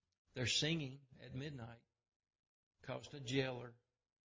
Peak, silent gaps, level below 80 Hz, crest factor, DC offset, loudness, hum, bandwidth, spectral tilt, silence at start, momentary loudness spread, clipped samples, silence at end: -24 dBFS; 2.16-2.20 s, 2.39-2.71 s; -70 dBFS; 22 dB; under 0.1%; -42 LUFS; none; 7.8 kHz; -4 dB/octave; 0.35 s; 20 LU; under 0.1%; 0.5 s